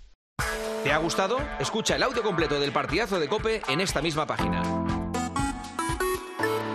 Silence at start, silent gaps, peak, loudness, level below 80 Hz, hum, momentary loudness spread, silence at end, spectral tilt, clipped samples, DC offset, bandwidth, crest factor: 0 s; 0.15-0.36 s; -8 dBFS; -27 LUFS; -42 dBFS; none; 5 LU; 0 s; -4 dB/octave; under 0.1%; under 0.1%; 13.5 kHz; 18 dB